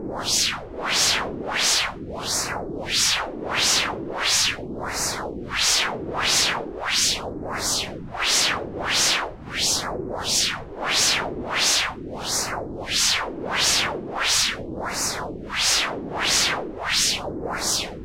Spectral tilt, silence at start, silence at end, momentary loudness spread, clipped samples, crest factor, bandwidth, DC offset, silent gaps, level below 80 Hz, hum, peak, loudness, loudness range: -0.5 dB/octave; 0 s; 0 s; 10 LU; under 0.1%; 16 dB; 16.5 kHz; under 0.1%; none; -46 dBFS; none; -8 dBFS; -22 LUFS; 1 LU